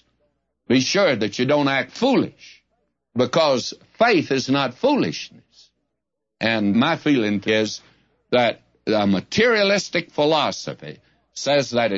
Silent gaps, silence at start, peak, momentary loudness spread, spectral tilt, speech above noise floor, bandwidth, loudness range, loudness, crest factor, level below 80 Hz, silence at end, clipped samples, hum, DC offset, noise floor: none; 0.7 s; -4 dBFS; 13 LU; -4.5 dB/octave; 61 dB; 7.8 kHz; 2 LU; -20 LUFS; 16 dB; -62 dBFS; 0 s; under 0.1%; none; under 0.1%; -80 dBFS